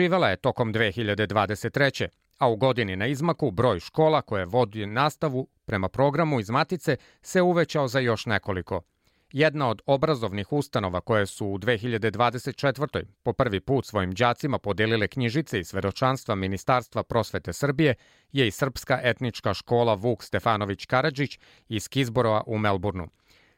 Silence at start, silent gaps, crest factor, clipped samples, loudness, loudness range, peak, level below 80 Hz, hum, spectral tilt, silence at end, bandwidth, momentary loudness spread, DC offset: 0 s; none; 18 dB; under 0.1%; -26 LUFS; 2 LU; -8 dBFS; -56 dBFS; none; -6 dB/octave; 0.5 s; 16.5 kHz; 7 LU; under 0.1%